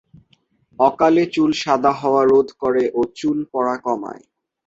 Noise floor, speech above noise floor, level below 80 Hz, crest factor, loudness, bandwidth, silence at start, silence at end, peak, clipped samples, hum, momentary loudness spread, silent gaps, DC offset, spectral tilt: -61 dBFS; 43 dB; -58 dBFS; 16 dB; -18 LUFS; 7.8 kHz; 0.8 s; 0.5 s; -2 dBFS; under 0.1%; none; 8 LU; none; under 0.1%; -5.5 dB/octave